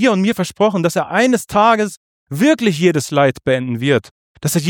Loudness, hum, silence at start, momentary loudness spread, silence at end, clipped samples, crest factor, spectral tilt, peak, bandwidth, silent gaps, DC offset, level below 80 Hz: -16 LUFS; none; 0 s; 5 LU; 0 s; under 0.1%; 14 dB; -5 dB/octave; -2 dBFS; 19.5 kHz; 1.97-2.27 s, 4.11-4.35 s; under 0.1%; -52 dBFS